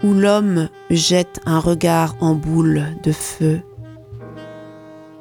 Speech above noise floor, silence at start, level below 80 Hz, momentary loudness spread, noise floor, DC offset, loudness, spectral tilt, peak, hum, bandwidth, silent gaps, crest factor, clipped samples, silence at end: 23 dB; 0 s; -44 dBFS; 22 LU; -39 dBFS; under 0.1%; -17 LUFS; -5.5 dB/octave; -2 dBFS; none; 18 kHz; none; 16 dB; under 0.1%; 0.05 s